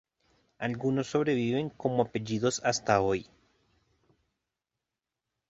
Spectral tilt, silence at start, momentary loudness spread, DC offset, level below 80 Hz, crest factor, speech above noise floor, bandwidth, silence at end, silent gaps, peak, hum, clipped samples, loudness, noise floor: -5 dB/octave; 0.6 s; 6 LU; under 0.1%; -62 dBFS; 22 dB; 59 dB; 8.2 kHz; 2.3 s; none; -10 dBFS; none; under 0.1%; -29 LUFS; -88 dBFS